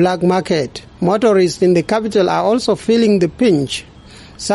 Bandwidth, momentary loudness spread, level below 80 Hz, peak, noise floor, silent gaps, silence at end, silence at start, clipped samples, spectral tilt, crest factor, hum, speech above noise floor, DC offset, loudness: 11.5 kHz; 8 LU; -46 dBFS; -4 dBFS; -38 dBFS; none; 0 s; 0 s; under 0.1%; -5.5 dB/octave; 12 dB; none; 24 dB; under 0.1%; -15 LUFS